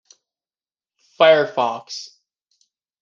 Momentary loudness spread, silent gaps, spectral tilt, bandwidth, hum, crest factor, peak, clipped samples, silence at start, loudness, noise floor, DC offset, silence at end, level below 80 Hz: 19 LU; none; -3.5 dB/octave; 7.4 kHz; none; 20 dB; -2 dBFS; under 0.1%; 1.2 s; -17 LUFS; under -90 dBFS; under 0.1%; 0.95 s; -74 dBFS